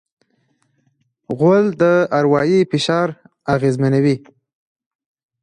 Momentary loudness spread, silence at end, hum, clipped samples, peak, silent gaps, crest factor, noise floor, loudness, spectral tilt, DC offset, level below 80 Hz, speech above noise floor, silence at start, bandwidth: 9 LU; 1.25 s; none; under 0.1%; -2 dBFS; none; 16 dB; -64 dBFS; -16 LUFS; -7 dB/octave; under 0.1%; -56 dBFS; 49 dB; 1.3 s; 11 kHz